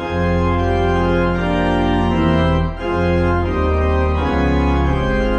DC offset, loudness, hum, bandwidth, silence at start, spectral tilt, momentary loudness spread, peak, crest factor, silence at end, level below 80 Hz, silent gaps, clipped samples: under 0.1%; -17 LUFS; none; 8.2 kHz; 0 s; -8 dB/octave; 2 LU; -2 dBFS; 14 dB; 0 s; -22 dBFS; none; under 0.1%